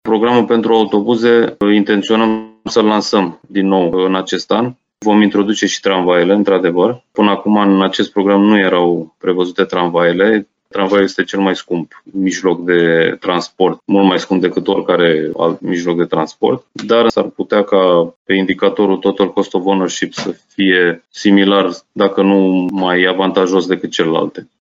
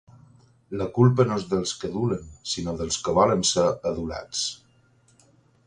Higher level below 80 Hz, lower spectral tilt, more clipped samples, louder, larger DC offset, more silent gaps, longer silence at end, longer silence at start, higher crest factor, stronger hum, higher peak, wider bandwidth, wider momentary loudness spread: second, -58 dBFS vs -50 dBFS; about the same, -5.5 dB/octave vs -5 dB/octave; neither; first, -13 LUFS vs -24 LUFS; neither; first, 18.16-18.25 s vs none; second, 0.2 s vs 1.1 s; second, 0.05 s vs 0.7 s; second, 14 dB vs 20 dB; neither; first, 0 dBFS vs -6 dBFS; second, 7.8 kHz vs 11 kHz; second, 7 LU vs 12 LU